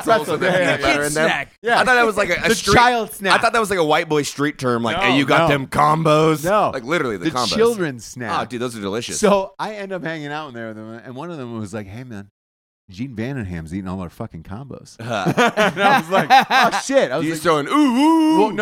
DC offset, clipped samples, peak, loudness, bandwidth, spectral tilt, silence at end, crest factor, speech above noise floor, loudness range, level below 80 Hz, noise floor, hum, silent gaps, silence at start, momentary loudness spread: under 0.1%; under 0.1%; 0 dBFS; -17 LUFS; 17 kHz; -4.5 dB/octave; 0 s; 18 dB; over 72 dB; 14 LU; -46 dBFS; under -90 dBFS; none; 1.58-1.62 s, 12.31-12.88 s; 0 s; 17 LU